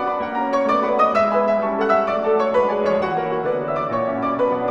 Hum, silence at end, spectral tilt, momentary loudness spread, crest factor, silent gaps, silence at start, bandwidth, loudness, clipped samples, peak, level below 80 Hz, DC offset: none; 0 s; -6.5 dB/octave; 5 LU; 14 dB; none; 0 s; 7.8 kHz; -19 LUFS; under 0.1%; -4 dBFS; -56 dBFS; 0.2%